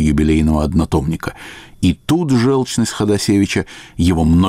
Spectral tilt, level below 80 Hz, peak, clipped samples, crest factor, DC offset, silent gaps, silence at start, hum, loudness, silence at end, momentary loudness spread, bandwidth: -6 dB/octave; -28 dBFS; -4 dBFS; under 0.1%; 10 dB; under 0.1%; none; 0 s; none; -16 LUFS; 0 s; 11 LU; 15.5 kHz